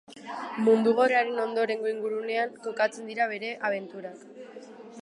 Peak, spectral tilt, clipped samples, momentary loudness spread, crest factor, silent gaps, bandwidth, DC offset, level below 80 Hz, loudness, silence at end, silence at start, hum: -10 dBFS; -5 dB/octave; under 0.1%; 23 LU; 18 dB; none; 11 kHz; under 0.1%; -84 dBFS; -27 LUFS; 0.05 s; 0.1 s; none